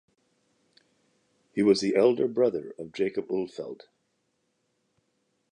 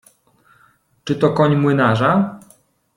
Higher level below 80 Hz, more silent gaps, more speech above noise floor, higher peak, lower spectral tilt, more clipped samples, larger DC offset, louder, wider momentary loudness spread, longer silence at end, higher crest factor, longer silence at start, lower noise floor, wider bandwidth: second, -72 dBFS vs -54 dBFS; neither; first, 50 dB vs 41 dB; second, -10 dBFS vs -2 dBFS; second, -5.5 dB/octave vs -7.5 dB/octave; neither; neither; second, -26 LUFS vs -16 LUFS; first, 17 LU vs 10 LU; first, 1.8 s vs 0.6 s; about the same, 20 dB vs 16 dB; first, 1.55 s vs 1.05 s; first, -75 dBFS vs -56 dBFS; second, 9.8 kHz vs 11.5 kHz